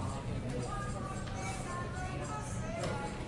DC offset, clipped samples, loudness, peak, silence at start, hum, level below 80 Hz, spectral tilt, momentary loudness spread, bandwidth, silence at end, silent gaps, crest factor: under 0.1%; under 0.1%; -39 LUFS; -24 dBFS; 0 s; none; -48 dBFS; -5.5 dB/octave; 2 LU; 11.5 kHz; 0 s; none; 14 dB